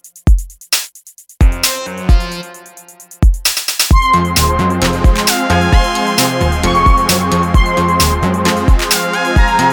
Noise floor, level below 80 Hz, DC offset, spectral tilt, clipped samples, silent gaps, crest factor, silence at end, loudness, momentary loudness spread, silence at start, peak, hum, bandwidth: -40 dBFS; -16 dBFS; under 0.1%; -4 dB/octave; under 0.1%; none; 12 dB; 0 s; -13 LUFS; 5 LU; 0.05 s; 0 dBFS; none; over 20 kHz